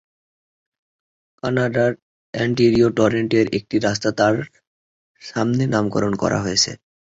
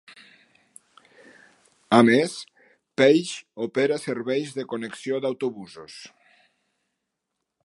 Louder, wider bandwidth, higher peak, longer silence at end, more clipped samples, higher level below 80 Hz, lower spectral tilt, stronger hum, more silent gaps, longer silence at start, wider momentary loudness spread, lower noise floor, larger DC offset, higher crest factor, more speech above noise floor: first, -19 LUFS vs -23 LUFS; second, 8 kHz vs 11.5 kHz; about the same, -4 dBFS vs -2 dBFS; second, 0.45 s vs 1.6 s; neither; first, -50 dBFS vs -76 dBFS; about the same, -5 dB/octave vs -5 dB/octave; neither; first, 2.02-2.33 s, 4.67-5.15 s vs none; second, 1.45 s vs 1.9 s; second, 13 LU vs 22 LU; first, under -90 dBFS vs -82 dBFS; neither; second, 18 dB vs 24 dB; first, over 71 dB vs 59 dB